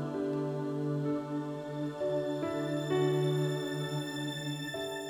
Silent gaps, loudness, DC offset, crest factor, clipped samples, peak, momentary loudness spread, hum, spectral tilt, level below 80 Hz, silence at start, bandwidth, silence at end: none; -34 LUFS; under 0.1%; 14 dB; under 0.1%; -18 dBFS; 7 LU; none; -6.5 dB/octave; -70 dBFS; 0 s; 19 kHz; 0 s